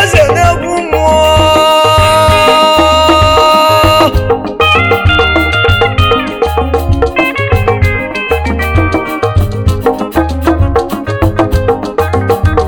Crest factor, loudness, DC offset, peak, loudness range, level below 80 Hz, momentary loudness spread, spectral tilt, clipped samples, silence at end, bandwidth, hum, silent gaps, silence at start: 8 dB; -9 LUFS; under 0.1%; 0 dBFS; 6 LU; -20 dBFS; 7 LU; -5 dB/octave; 2%; 0 s; 18.5 kHz; none; none; 0 s